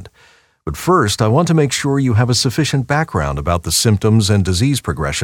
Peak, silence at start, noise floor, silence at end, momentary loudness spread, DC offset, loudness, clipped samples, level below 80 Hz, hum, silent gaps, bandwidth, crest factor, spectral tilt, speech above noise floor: 0 dBFS; 0 s; -51 dBFS; 0 s; 6 LU; under 0.1%; -15 LUFS; under 0.1%; -34 dBFS; none; none; 17.5 kHz; 14 dB; -5 dB/octave; 36 dB